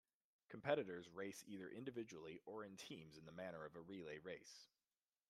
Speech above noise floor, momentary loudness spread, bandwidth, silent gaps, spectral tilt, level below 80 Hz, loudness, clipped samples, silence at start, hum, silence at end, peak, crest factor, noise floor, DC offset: over 39 dB; 13 LU; 13.5 kHz; none; -5 dB/octave; -88 dBFS; -52 LUFS; under 0.1%; 0.5 s; none; 0.65 s; -26 dBFS; 26 dB; under -90 dBFS; under 0.1%